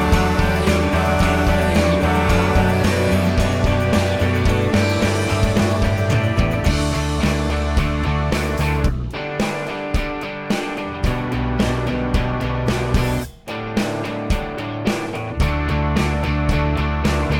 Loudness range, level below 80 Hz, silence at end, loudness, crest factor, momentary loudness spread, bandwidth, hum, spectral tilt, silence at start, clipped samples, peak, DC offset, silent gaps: 5 LU; -24 dBFS; 0 s; -19 LUFS; 16 dB; 7 LU; 17 kHz; none; -6 dB/octave; 0 s; under 0.1%; -2 dBFS; under 0.1%; none